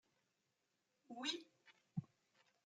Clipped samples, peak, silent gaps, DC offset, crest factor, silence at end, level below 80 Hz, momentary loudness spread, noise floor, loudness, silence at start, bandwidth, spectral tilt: under 0.1%; -28 dBFS; none; under 0.1%; 26 dB; 0.6 s; under -90 dBFS; 14 LU; -87 dBFS; -48 LUFS; 1.1 s; 11.5 kHz; -4 dB/octave